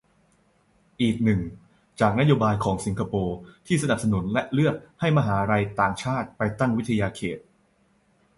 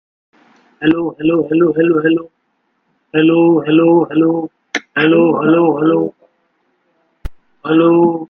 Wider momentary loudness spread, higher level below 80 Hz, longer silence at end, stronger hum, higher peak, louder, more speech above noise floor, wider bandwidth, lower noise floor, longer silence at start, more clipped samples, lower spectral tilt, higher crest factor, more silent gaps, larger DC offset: about the same, 7 LU vs 9 LU; second, -48 dBFS vs -42 dBFS; first, 1 s vs 0.05 s; neither; second, -6 dBFS vs 0 dBFS; second, -24 LUFS vs -13 LUFS; second, 40 dB vs 53 dB; first, 11.5 kHz vs 6.6 kHz; about the same, -64 dBFS vs -65 dBFS; first, 1 s vs 0.8 s; neither; about the same, -6.5 dB/octave vs -7.5 dB/octave; about the same, 18 dB vs 14 dB; neither; neither